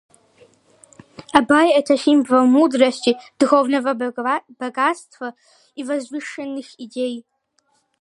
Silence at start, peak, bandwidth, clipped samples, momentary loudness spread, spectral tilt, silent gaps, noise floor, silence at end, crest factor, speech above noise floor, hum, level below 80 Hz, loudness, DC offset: 1.2 s; 0 dBFS; 11 kHz; under 0.1%; 18 LU; -3.5 dB/octave; none; -66 dBFS; 0.8 s; 20 dB; 47 dB; none; -66 dBFS; -18 LUFS; under 0.1%